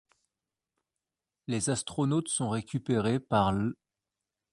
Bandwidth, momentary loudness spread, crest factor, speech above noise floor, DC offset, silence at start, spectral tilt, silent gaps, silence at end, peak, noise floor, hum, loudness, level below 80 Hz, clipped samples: 11.5 kHz; 8 LU; 22 dB; over 61 dB; under 0.1%; 1.5 s; -5 dB/octave; none; 0.8 s; -10 dBFS; under -90 dBFS; none; -30 LUFS; -58 dBFS; under 0.1%